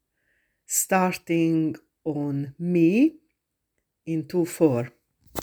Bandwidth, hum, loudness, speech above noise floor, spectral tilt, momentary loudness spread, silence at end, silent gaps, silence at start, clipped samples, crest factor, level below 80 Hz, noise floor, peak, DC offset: over 20 kHz; none; -24 LUFS; 56 dB; -5.5 dB/octave; 12 LU; 0 s; none; 0.7 s; under 0.1%; 18 dB; -66 dBFS; -79 dBFS; -6 dBFS; under 0.1%